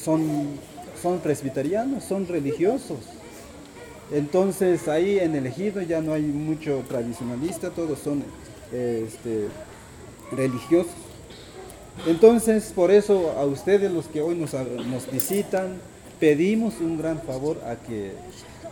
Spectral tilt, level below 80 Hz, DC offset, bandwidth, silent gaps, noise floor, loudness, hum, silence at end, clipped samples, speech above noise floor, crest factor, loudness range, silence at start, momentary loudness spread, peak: -6 dB/octave; -54 dBFS; under 0.1%; 19 kHz; none; -43 dBFS; -24 LUFS; none; 0 s; under 0.1%; 20 dB; 22 dB; 8 LU; 0 s; 21 LU; -2 dBFS